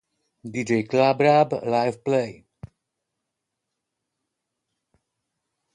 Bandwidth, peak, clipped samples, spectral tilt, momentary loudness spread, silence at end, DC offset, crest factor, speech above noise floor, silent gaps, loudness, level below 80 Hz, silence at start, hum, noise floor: 11 kHz; -6 dBFS; under 0.1%; -6.5 dB/octave; 15 LU; 3.45 s; under 0.1%; 20 dB; 61 dB; none; -21 LUFS; -64 dBFS; 0.45 s; none; -82 dBFS